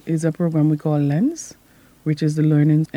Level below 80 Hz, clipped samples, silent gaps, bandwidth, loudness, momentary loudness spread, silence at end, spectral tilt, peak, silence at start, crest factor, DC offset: -62 dBFS; under 0.1%; none; 10.5 kHz; -19 LUFS; 11 LU; 0.1 s; -8 dB/octave; -6 dBFS; 0.05 s; 12 dB; under 0.1%